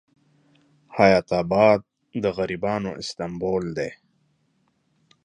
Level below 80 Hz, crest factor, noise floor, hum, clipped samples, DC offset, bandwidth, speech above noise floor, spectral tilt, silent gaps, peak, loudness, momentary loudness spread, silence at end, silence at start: -54 dBFS; 22 dB; -68 dBFS; none; under 0.1%; under 0.1%; 10 kHz; 46 dB; -6 dB/octave; none; -2 dBFS; -23 LUFS; 13 LU; 1.3 s; 0.9 s